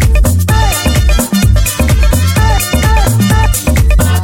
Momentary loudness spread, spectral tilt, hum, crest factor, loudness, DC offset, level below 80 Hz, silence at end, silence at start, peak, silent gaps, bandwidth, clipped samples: 1 LU; -5 dB/octave; none; 8 dB; -10 LUFS; under 0.1%; -12 dBFS; 0 s; 0 s; 0 dBFS; none; 17 kHz; under 0.1%